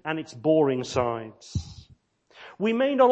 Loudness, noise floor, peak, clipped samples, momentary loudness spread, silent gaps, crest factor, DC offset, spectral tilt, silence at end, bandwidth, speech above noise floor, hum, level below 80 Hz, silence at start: -26 LUFS; -59 dBFS; -6 dBFS; under 0.1%; 13 LU; none; 18 dB; under 0.1%; -6 dB/octave; 0 s; 8.6 kHz; 35 dB; none; -50 dBFS; 0.05 s